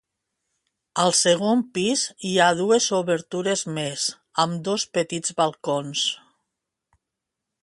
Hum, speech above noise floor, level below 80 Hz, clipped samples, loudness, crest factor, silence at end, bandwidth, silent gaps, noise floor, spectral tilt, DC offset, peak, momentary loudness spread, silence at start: none; 62 dB; -68 dBFS; under 0.1%; -22 LUFS; 20 dB; 1.45 s; 11.5 kHz; none; -84 dBFS; -3 dB/octave; under 0.1%; -4 dBFS; 8 LU; 0.95 s